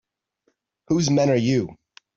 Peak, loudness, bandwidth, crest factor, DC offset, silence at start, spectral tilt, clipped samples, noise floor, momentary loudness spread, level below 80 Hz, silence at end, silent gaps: -8 dBFS; -21 LUFS; 7.8 kHz; 16 dB; under 0.1%; 0.9 s; -6 dB/octave; under 0.1%; -71 dBFS; 6 LU; -58 dBFS; 0.45 s; none